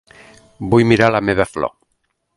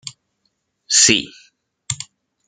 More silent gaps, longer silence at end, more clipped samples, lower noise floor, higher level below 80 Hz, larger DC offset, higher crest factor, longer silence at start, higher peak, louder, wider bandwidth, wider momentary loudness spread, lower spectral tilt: neither; first, 0.7 s vs 0.45 s; neither; about the same, -69 dBFS vs -70 dBFS; first, -44 dBFS vs -58 dBFS; neither; about the same, 18 dB vs 22 dB; first, 0.6 s vs 0.05 s; about the same, 0 dBFS vs 0 dBFS; about the same, -16 LUFS vs -15 LUFS; about the same, 11.5 kHz vs 12 kHz; second, 13 LU vs 24 LU; first, -6.5 dB/octave vs -0.5 dB/octave